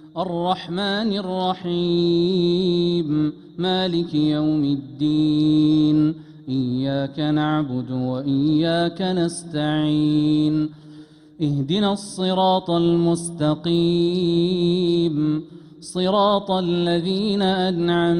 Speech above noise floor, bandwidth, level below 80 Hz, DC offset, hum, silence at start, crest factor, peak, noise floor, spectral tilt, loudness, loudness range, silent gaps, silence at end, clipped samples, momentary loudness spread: 24 dB; 11 kHz; -54 dBFS; under 0.1%; none; 0 s; 14 dB; -8 dBFS; -44 dBFS; -6.5 dB/octave; -21 LUFS; 2 LU; none; 0 s; under 0.1%; 6 LU